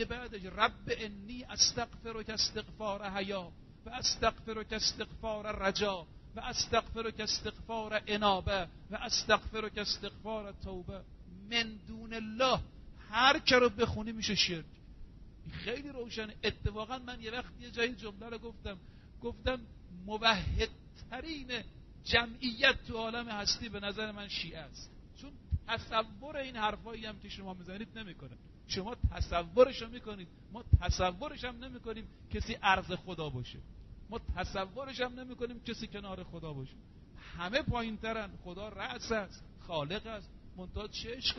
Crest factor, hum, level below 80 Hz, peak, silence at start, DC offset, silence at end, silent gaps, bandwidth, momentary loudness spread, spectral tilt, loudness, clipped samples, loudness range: 26 dB; none; -48 dBFS; -10 dBFS; 0 s; under 0.1%; 0 s; none; 6.2 kHz; 18 LU; -2.5 dB/octave; -35 LUFS; under 0.1%; 9 LU